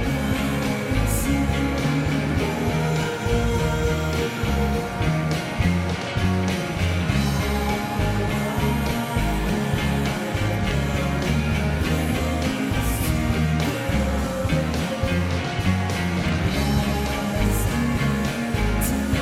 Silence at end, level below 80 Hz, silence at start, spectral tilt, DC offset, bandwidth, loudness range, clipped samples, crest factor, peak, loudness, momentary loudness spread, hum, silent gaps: 0 s; -30 dBFS; 0 s; -5.5 dB/octave; under 0.1%; 16.5 kHz; 1 LU; under 0.1%; 14 dB; -8 dBFS; -23 LUFS; 2 LU; none; none